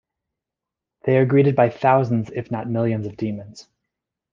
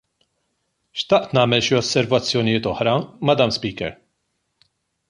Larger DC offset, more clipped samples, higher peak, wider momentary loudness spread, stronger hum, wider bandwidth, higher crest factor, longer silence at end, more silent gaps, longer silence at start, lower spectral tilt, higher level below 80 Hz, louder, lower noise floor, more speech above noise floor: neither; neither; about the same, -2 dBFS vs -2 dBFS; about the same, 12 LU vs 11 LU; neither; second, 7.4 kHz vs 11 kHz; about the same, 18 dB vs 20 dB; second, 0.7 s vs 1.15 s; neither; about the same, 1.05 s vs 0.95 s; first, -9 dB/octave vs -5 dB/octave; second, -62 dBFS vs -52 dBFS; about the same, -20 LUFS vs -19 LUFS; first, -86 dBFS vs -73 dBFS; first, 67 dB vs 54 dB